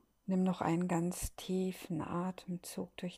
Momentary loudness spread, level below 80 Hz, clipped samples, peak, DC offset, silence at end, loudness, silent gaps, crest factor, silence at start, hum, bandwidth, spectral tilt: 9 LU; -58 dBFS; under 0.1%; -20 dBFS; under 0.1%; 0 s; -37 LUFS; none; 18 dB; 0.25 s; none; 15.5 kHz; -6 dB/octave